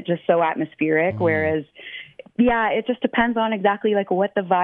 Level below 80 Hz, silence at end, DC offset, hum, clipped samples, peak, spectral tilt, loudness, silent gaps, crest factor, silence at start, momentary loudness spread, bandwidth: -52 dBFS; 0 s; under 0.1%; none; under 0.1%; -4 dBFS; -9.5 dB/octave; -21 LUFS; none; 16 dB; 0 s; 13 LU; 4.1 kHz